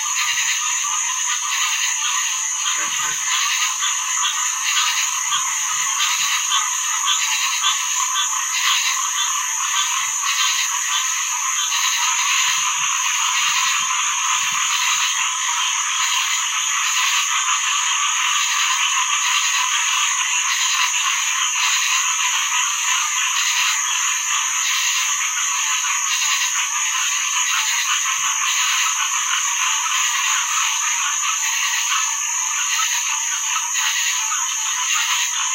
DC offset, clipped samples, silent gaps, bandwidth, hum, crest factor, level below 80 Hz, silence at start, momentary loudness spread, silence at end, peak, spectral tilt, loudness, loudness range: under 0.1%; under 0.1%; none; 16 kHz; none; 16 dB; under -90 dBFS; 0 s; 2 LU; 0 s; -4 dBFS; 6 dB/octave; -17 LUFS; 1 LU